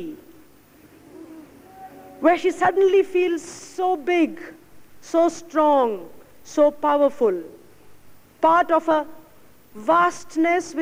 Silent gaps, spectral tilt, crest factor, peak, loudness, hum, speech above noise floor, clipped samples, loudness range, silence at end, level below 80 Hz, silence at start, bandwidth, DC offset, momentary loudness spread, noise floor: none; -4.5 dB/octave; 16 dB; -6 dBFS; -20 LUFS; none; 32 dB; under 0.1%; 1 LU; 0 s; -62 dBFS; 0 s; 16 kHz; under 0.1%; 17 LU; -52 dBFS